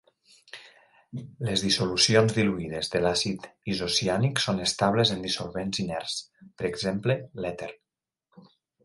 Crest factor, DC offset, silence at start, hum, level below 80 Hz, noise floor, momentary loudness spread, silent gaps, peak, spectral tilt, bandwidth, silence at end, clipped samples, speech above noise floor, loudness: 22 dB; under 0.1%; 0.55 s; none; -56 dBFS; -89 dBFS; 19 LU; none; -6 dBFS; -4 dB/octave; 11.5 kHz; 0.45 s; under 0.1%; 62 dB; -26 LUFS